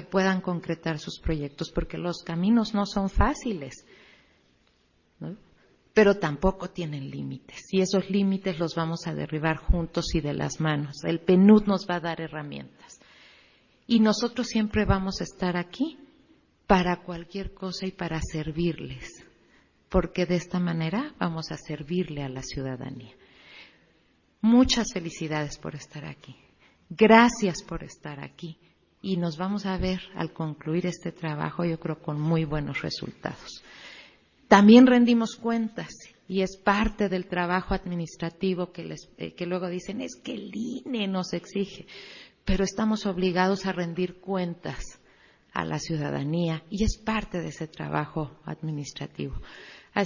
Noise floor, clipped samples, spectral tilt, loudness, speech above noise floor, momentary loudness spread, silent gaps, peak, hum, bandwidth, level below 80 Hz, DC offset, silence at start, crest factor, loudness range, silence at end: -66 dBFS; under 0.1%; -6 dB/octave; -26 LUFS; 40 dB; 18 LU; none; -2 dBFS; none; 7.4 kHz; -42 dBFS; under 0.1%; 0 s; 24 dB; 10 LU; 0 s